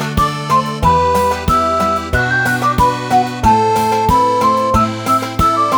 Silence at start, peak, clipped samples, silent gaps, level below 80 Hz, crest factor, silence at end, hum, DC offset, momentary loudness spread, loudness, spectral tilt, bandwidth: 0 s; 0 dBFS; under 0.1%; none; -28 dBFS; 14 dB; 0 s; none; under 0.1%; 3 LU; -13 LUFS; -5 dB/octave; over 20 kHz